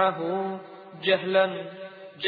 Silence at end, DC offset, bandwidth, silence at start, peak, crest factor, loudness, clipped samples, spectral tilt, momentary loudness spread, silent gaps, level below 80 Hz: 0 s; under 0.1%; 4.9 kHz; 0 s; -8 dBFS; 18 dB; -26 LUFS; under 0.1%; -8 dB/octave; 19 LU; none; -90 dBFS